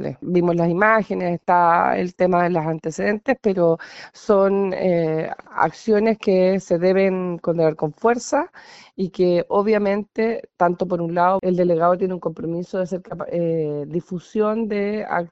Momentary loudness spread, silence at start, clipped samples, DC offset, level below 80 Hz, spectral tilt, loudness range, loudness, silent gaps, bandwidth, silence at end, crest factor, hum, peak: 10 LU; 0 s; under 0.1%; under 0.1%; -56 dBFS; -6.5 dB/octave; 3 LU; -20 LUFS; none; 8 kHz; 0.05 s; 18 dB; none; -2 dBFS